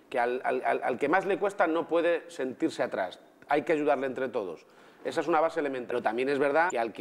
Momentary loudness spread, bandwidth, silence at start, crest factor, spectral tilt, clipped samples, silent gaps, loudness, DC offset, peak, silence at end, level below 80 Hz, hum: 8 LU; 13 kHz; 0.1 s; 18 dB; -5 dB/octave; under 0.1%; none; -29 LUFS; under 0.1%; -10 dBFS; 0 s; -78 dBFS; none